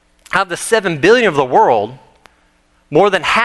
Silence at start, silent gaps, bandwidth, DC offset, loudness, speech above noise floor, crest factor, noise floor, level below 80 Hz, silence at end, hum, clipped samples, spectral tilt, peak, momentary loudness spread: 0.3 s; none; 12.5 kHz; under 0.1%; -13 LUFS; 43 dB; 14 dB; -55 dBFS; -50 dBFS; 0 s; none; under 0.1%; -4 dB/octave; 0 dBFS; 7 LU